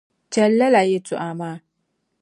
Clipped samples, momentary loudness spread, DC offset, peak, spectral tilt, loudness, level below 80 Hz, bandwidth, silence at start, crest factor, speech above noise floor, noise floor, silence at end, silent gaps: under 0.1%; 16 LU; under 0.1%; -4 dBFS; -5.5 dB/octave; -19 LUFS; -72 dBFS; 11.5 kHz; 0.3 s; 16 dB; 54 dB; -73 dBFS; 0.65 s; none